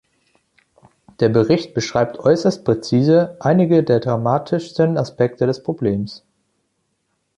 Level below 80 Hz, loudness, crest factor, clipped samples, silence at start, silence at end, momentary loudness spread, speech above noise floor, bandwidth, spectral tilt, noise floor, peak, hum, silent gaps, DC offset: -52 dBFS; -18 LUFS; 16 dB; under 0.1%; 1.2 s; 1.2 s; 7 LU; 53 dB; 10.5 kHz; -7 dB/octave; -70 dBFS; -2 dBFS; none; none; under 0.1%